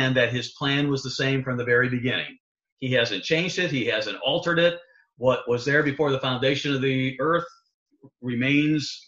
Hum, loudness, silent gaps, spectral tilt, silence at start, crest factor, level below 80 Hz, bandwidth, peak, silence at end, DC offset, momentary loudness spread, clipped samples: none; -24 LUFS; 2.40-2.55 s, 2.72-2.77 s, 7.74-7.86 s; -5.5 dB/octave; 0 s; 18 dB; -60 dBFS; 7.8 kHz; -8 dBFS; 0.1 s; under 0.1%; 5 LU; under 0.1%